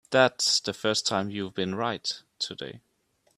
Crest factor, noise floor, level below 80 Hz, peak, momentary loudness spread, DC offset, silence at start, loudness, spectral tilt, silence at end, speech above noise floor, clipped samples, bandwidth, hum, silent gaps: 24 dB; -70 dBFS; -68 dBFS; -4 dBFS; 11 LU; under 0.1%; 0.1 s; -27 LUFS; -2.5 dB/octave; 0.6 s; 42 dB; under 0.1%; 14.5 kHz; none; none